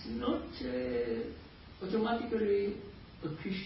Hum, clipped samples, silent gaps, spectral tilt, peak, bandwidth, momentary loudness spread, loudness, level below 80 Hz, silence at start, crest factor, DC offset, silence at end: none; under 0.1%; none; -5 dB/octave; -20 dBFS; 5.6 kHz; 14 LU; -36 LUFS; -56 dBFS; 0 s; 16 dB; under 0.1%; 0 s